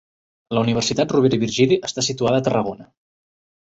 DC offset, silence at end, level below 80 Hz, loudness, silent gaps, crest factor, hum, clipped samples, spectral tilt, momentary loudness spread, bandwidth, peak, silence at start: under 0.1%; 0.8 s; -54 dBFS; -19 LUFS; none; 18 dB; none; under 0.1%; -5 dB/octave; 7 LU; 8.2 kHz; -4 dBFS; 0.5 s